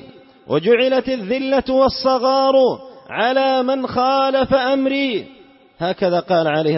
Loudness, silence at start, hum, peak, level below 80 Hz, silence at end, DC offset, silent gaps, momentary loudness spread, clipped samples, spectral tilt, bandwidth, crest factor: -17 LUFS; 0 s; none; -2 dBFS; -50 dBFS; 0 s; under 0.1%; none; 7 LU; under 0.1%; -8 dB/octave; 6 kHz; 14 dB